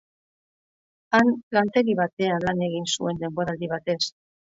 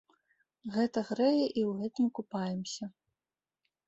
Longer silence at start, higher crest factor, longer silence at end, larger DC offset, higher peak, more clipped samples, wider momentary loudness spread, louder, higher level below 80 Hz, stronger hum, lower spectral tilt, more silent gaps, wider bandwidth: first, 1.1 s vs 0.65 s; about the same, 18 dB vs 18 dB; second, 0.5 s vs 0.95 s; neither; first, -8 dBFS vs -16 dBFS; neither; second, 8 LU vs 13 LU; first, -24 LUFS vs -32 LUFS; first, -60 dBFS vs -76 dBFS; neither; second, -4.5 dB/octave vs -6 dB/octave; first, 1.43-1.51 s, 2.13-2.17 s vs none; about the same, 8 kHz vs 8.2 kHz